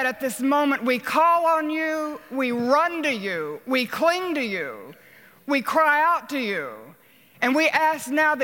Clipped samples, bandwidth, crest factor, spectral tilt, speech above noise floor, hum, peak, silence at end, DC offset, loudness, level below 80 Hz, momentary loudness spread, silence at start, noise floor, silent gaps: under 0.1%; 17 kHz; 16 dB; -3.5 dB/octave; 31 dB; none; -6 dBFS; 0 s; under 0.1%; -22 LUFS; -72 dBFS; 11 LU; 0 s; -54 dBFS; none